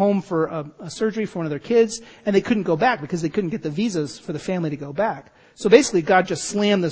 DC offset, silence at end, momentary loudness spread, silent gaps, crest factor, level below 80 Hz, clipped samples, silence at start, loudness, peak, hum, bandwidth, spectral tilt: under 0.1%; 0 s; 11 LU; none; 20 dB; -58 dBFS; under 0.1%; 0 s; -21 LUFS; 0 dBFS; none; 8 kHz; -5 dB/octave